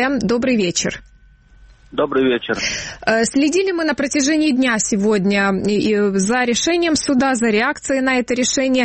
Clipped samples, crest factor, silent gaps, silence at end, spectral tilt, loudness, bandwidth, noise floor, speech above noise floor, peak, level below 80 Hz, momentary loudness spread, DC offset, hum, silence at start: under 0.1%; 14 dB; none; 0 s; -3.5 dB/octave; -17 LUFS; 8.8 kHz; -48 dBFS; 31 dB; -2 dBFS; -46 dBFS; 4 LU; under 0.1%; none; 0 s